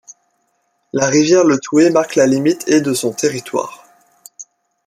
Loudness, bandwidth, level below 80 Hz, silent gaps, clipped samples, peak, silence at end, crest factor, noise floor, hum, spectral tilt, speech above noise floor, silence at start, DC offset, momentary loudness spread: -14 LUFS; 15 kHz; -60 dBFS; none; under 0.1%; -2 dBFS; 0.45 s; 14 dB; -65 dBFS; none; -4.5 dB/octave; 51 dB; 0.95 s; under 0.1%; 12 LU